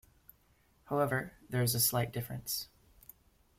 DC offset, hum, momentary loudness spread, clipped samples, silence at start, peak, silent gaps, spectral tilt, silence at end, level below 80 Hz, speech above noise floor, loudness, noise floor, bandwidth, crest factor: under 0.1%; none; 10 LU; under 0.1%; 0.9 s; -16 dBFS; none; -4 dB/octave; 0.95 s; -64 dBFS; 35 dB; -33 LUFS; -69 dBFS; 16.5 kHz; 20 dB